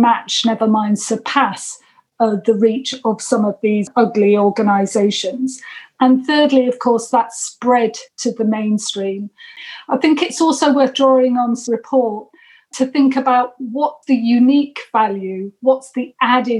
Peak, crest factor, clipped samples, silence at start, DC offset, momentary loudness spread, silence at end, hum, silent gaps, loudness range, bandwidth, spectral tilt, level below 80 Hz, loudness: -2 dBFS; 14 dB; under 0.1%; 0 s; under 0.1%; 11 LU; 0 s; none; none; 2 LU; 11.5 kHz; -4.5 dB/octave; -70 dBFS; -16 LUFS